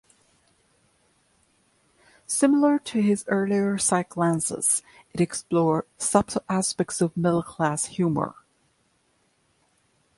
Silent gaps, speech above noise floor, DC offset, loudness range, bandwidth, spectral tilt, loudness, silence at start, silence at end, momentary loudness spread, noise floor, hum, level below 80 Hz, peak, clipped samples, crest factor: none; 44 dB; under 0.1%; 4 LU; 12 kHz; -5 dB/octave; -24 LUFS; 2.3 s; 1.85 s; 6 LU; -68 dBFS; none; -60 dBFS; -4 dBFS; under 0.1%; 22 dB